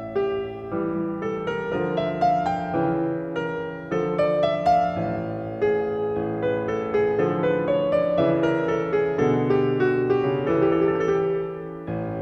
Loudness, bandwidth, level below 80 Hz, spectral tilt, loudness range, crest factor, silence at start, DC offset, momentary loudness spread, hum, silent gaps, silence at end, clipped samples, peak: -23 LUFS; 8 kHz; -52 dBFS; -8 dB/octave; 4 LU; 14 dB; 0 s; under 0.1%; 7 LU; none; none; 0 s; under 0.1%; -10 dBFS